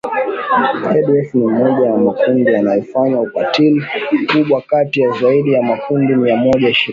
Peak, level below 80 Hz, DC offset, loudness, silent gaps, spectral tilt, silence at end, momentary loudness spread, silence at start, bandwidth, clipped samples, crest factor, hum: -2 dBFS; -54 dBFS; under 0.1%; -14 LUFS; none; -7.5 dB/octave; 0 s; 4 LU; 0.05 s; 7.4 kHz; under 0.1%; 12 dB; none